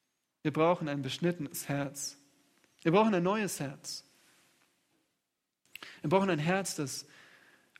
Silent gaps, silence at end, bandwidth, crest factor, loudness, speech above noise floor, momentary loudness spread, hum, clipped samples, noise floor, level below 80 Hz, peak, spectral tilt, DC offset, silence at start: none; 0.75 s; 16 kHz; 22 dB; -32 LUFS; 54 dB; 14 LU; none; under 0.1%; -85 dBFS; -74 dBFS; -12 dBFS; -5 dB/octave; under 0.1%; 0.45 s